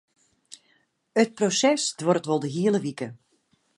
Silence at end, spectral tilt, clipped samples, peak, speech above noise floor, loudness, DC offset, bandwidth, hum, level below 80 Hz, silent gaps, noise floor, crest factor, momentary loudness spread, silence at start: 0.65 s; -4 dB/octave; under 0.1%; -6 dBFS; 44 dB; -24 LUFS; under 0.1%; 11.5 kHz; none; -76 dBFS; none; -68 dBFS; 20 dB; 11 LU; 1.15 s